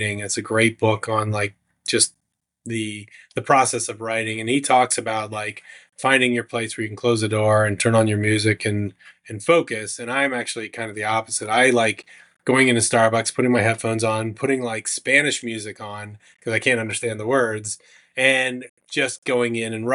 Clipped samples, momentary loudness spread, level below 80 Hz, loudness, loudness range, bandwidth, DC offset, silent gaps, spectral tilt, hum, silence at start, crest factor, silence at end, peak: under 0.1%; 14 LU; -70 dBFS; -20 LUFS; 3 LU; 11.5 kHz; under 0.1%; 18.69-18.77 s, 19.18-19.22 s; -4 dB/octave; none; 0 s; 20 dB; 0 s; -2 dBFS